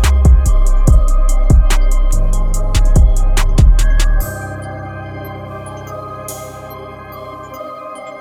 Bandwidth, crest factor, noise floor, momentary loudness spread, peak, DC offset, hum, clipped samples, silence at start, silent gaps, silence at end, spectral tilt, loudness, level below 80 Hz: 14 kHz; 12 dB; -30 dBFS; 17 LU; 0 dBFS; under 0.1%; none; under 0.1%; 0 s; none; 0 s; -5.5 dB/octave; -15 LUFS; -12 dBFS